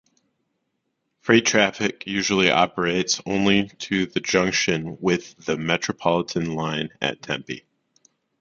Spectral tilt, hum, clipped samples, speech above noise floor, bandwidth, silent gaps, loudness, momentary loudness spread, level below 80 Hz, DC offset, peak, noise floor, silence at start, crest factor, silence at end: -3.5 dB/octave; none; under 0.1%; 53 dB; 7.6 kHz; none; -22 LUFS; 10 LU; -56 dBFS; under 0.1%; 0 dBFS; -76 dBFS; 1.25 s; 22 dB; 0.8 s